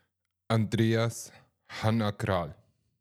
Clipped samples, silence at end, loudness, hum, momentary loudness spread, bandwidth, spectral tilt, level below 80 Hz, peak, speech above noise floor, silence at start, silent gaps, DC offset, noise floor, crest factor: under 0.1%; 0.5 s; -29 LUFS; none; 15 LU; 14.5 kHz; -6 dB/octave; -64 dBFS; -12 dBFS; 50 dB; 0.5 s; none; under 0.1%; -78 dBFS; 20 dB